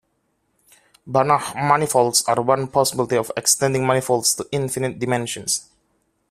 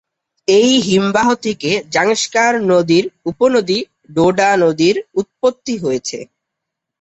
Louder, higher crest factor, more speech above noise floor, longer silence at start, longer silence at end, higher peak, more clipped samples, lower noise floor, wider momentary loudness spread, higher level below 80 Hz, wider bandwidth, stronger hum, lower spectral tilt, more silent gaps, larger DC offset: second, -19 LUFS vs -15 LUFS; first, 20 dB vs 14 dB; second, 49 dB vs 65 dB; first, 1.05 s vs 0.5 s; about the same, 0.7 s vs 0.75 s; about the same, -2 dBFS vs -2 dBFS; neither; second, -69 dBFS vs -79 dBFS; about the same, 7 LU vs 9 LU; about the same, -58 dBFS vs -54 dBFS; first, 15.5 kHz vs 8.2 kHz; neither; about the same, -3.5 dB/octave vs -4 dB/octave; neither; neither